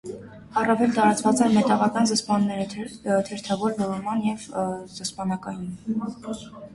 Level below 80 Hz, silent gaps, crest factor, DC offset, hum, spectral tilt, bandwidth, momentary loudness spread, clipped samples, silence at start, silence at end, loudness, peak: -60 dBFS; none; 18 dB; under 0.1%; none; -5 dB/octave; 11.5 kHz; 14 LU; under 0.1%; 0.05 s; 0 s; -24 LUFS; -6 dBFS